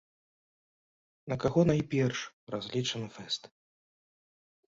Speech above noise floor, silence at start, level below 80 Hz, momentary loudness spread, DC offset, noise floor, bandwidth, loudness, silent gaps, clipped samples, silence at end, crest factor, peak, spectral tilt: over 59 dB; 1.25 s; -60 dBFS; 12 LU; under 0.1%; under -90 dBFS; 7.8 kHz; -32 LUFS; 2.33-2.47 s; under 0.1%; 1.25 s; 20 dB; -14 dBFS; -5.5 dB/octave